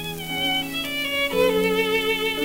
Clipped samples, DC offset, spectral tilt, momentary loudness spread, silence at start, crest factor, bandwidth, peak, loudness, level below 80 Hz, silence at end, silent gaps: under 0.1%; under 0.1%; -3.5 dB/octave; 5 LU; 0 s; 14 dB; 16.5 kHz; -8 dBFS; -22 LUFS; -50 dBFS; 0 s; none